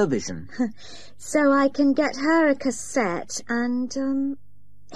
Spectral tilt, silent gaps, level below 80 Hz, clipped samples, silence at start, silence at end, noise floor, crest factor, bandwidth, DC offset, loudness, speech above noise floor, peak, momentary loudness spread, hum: -4.5 dB/octave; none; -58 dBFS; under 0.1%; 0 s; 0 s; -49 dBFS; 14 dB; 12.5 kHz; 1%; -23 LUFS; 26 dB; -10 dBFS; 13 LU; 50 Hz at -60 dBFS